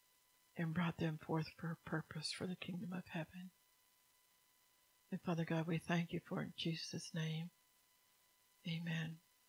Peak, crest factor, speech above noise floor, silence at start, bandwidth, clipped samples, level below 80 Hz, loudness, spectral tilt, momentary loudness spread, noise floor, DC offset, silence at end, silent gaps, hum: -24 dBFS; 20 dB; 32 dB; 0.55 s; 16 kHz; under 0.1%; -80 dBFS; -44 LUFS; -5.5 dB/octave; 10 LU; -75 dBFS; under 0.1%; 0.3 s; none; none